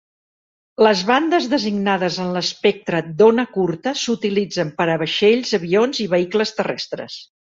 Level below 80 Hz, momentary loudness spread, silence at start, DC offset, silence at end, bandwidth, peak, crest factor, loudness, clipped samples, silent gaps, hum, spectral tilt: -62 dBFS; 9 LU; 0.8 s; under 0.1%; 0.25 s; 7.8 kHz; -2 dBFS; 16 dB; -18 LUFS; under 0.1%; none; none; -5 dB/octave